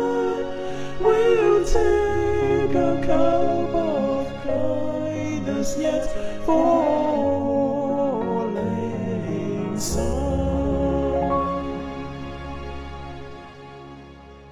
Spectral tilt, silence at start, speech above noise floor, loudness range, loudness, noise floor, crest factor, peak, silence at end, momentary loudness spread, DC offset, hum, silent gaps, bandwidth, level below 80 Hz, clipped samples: -6.5 dB/octave; 0 s; 23 dB; 6 LU; -23 LUFS; -43 dBFS; 16 dB; -6 dBFS; 0 s; 15 LU; under 0.1%; none; none; 14 kHz; -34 dBFS; under 0.1%